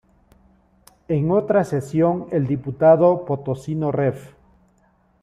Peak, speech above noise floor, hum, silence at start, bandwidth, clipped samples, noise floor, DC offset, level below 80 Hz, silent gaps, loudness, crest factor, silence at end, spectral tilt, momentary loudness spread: -4 dBFS; 41 dB; none; 1.1 s; 12.5 kHz; under 0.1%; -60 dBFS; under 0.1%; -54 dBFS; none; -20 LUFS; 18 dB; 0.95 s; -9 dB/octave; 10 LU